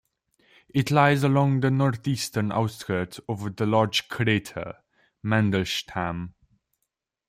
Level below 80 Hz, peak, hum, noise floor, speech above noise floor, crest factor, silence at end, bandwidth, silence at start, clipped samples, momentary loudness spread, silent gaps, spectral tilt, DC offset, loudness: -58 dBFS; -6 dBFS; none; -81 dBFS; 57 dB; 18 dB; 1 s; 15.5 kHz; 0.75 s; under 0.1%; 14 LU; none; -6 dB/octave; under 0.1%; -24 LUFS